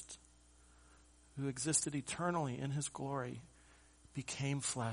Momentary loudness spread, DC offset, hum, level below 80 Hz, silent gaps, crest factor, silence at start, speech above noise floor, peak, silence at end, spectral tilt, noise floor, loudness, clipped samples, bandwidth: 17 LU; under 0.1%; none; -68 dBFS; none; 22 dB; 0 s; 26 dB; -20 dBFS; 0 s; -4 dB/octave; -65 dBFS; -39 LUFS; under 0.1%; 10.5 kHz